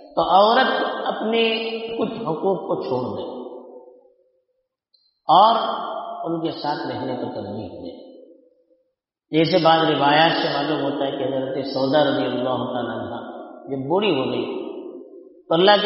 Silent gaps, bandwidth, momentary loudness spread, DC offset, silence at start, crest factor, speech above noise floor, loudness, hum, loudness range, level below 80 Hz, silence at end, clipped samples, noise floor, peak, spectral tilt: none; 6 kHz; 18 LU; under 0.1%; 0 s; 20 dB; 54 dB; -21 LUFS; none; 8 LU; -64 dBFS; 0 s; under 0.1%; -74 dBFS; -2 dBFS; -2.5 dB/octave